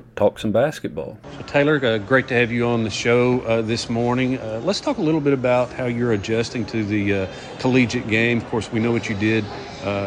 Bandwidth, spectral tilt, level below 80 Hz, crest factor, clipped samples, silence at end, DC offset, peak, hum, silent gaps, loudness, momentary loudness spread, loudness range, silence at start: 10.5 kHz; -6 dB/octave; -50 dBFS; 16 dB; under 0.1%; 0 s; under 0.1%; -4 dBFS; none; none; -21 LUFS; 7 LU; 2 LU; 0.15 s